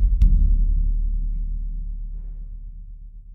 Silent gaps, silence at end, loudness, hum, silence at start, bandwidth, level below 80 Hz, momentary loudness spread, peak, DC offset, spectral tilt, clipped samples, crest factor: none; 0 s; -25 LUFS; none; 0 s; 0.5 kHz; -20 dBFS; 22 LU; -6 dBFS; under 0.1%; -10 dB/octave; under 0.1%; 14 dB